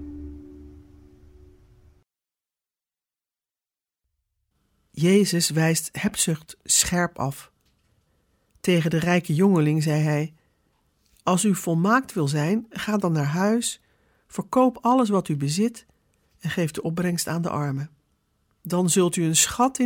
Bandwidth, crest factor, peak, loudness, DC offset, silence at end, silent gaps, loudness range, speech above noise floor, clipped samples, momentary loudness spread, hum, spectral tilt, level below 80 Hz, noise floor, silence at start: 17.5 kHz; 20 dB; -6 dBFS; -23 LUFS; under 0.1%; 0 s; none; 4 LU; over 68 dB; under 0.1%; 14 LU; none; -4.5 dB/octave; -56 dBFS; under -90 dBFS; 0 s